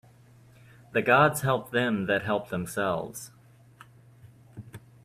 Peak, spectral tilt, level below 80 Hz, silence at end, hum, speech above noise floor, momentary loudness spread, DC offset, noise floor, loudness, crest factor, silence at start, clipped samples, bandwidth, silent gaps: -8 dBFS; -5 dB/octave; -62 dBFS; 0.25 s; none; 29 dB; 25 LU; under 0.1%; -55 dBFS; -26 LUFS; 22 dB; 0.95 s; under 0.1%; 16 kHz; none